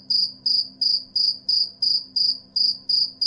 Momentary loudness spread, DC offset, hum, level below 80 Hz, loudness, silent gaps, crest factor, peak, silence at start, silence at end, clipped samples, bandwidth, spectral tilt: 2 LU; under 0.1%; none; -68 dBFS; -20 LUFS; none; 12 dB; -10 dBFS; 0.1 s; 0 s; under 0.1%; 11.5 kHz; -1 dB/octave